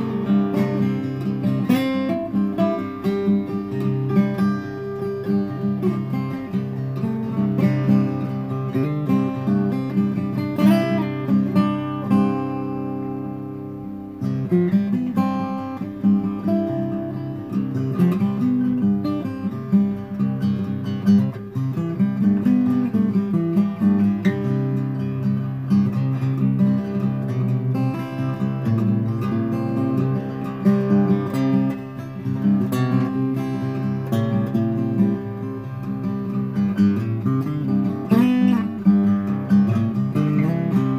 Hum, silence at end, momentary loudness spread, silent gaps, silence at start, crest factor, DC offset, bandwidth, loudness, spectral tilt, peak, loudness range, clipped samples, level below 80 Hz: none; 0 s; 8 LU; none; 0 s; 16 dB; 0.1%; 15 kHz; -21 LUFS; -9 dB/octave; -4 dBFS; 3 LU; under 0.1%; -56 dBFS